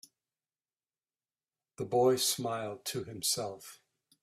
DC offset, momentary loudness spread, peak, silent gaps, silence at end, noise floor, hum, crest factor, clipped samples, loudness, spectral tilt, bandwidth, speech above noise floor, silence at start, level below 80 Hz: under 0.1%; 16 LU; -16 dBFS; none; 0.45 s; under -90 dBFS; none; 20 dB; under 0.1%; -32 LUFS; -3 dB/octave; 16 kHz; over 57 dB; 1.8 s; -74 dBFS